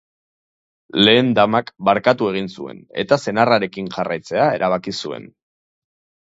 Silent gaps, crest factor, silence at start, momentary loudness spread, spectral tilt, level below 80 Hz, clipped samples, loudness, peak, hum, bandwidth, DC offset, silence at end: none; 20 dB; 0.95 s; 15 LU; -5.5 dB/octave; -58 dBFS; under 0.1%; -18 LUFS; 0 dBFS; none; 8 kHz; under 0.1%; 0.95 s